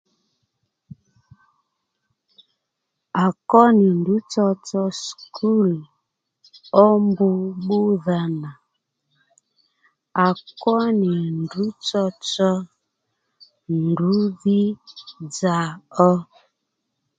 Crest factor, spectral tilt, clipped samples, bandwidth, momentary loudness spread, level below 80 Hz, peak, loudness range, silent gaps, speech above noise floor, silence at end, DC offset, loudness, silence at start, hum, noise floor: 22 dB; -6.5 dB/octave; under 0.1%; 9 kHz; 13 LU; -68 dBFS; 0 dBFS; 5 LU; none; 60 dB; 0.95 s; under 0.1%; -20 LUFS; 3.15 s; none; -79 dBFS